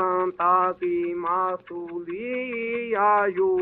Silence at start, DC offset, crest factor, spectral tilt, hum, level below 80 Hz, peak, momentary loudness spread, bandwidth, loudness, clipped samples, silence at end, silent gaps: 0 s; under 0.1%; 16 dB; -9.5 dB/octave; none; -66 dBFS; -8 dBFS; 12 LU; 4 kHz; -24 LUFS; under 0.1%; 0 s; none